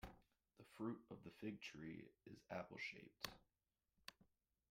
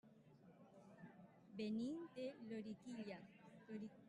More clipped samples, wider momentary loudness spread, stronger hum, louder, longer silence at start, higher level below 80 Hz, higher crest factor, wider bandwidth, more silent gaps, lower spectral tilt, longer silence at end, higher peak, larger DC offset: neither; second, 12 LU vs 20 LU; neither; second, -55 LUFS vs -51 LUFS; about the same, 0 s vs 0.05 s; first, -76 dBFS vs -90 dBFS; first, 26 dB vs 16 dB; first, 16 kHz vs 11 kHz; neither; second, -4.5 dB/octave vs -6.5 dB/octave; first, 0.45 s vs 0 s; first, -30 dBFS vs -38 dBFS; neither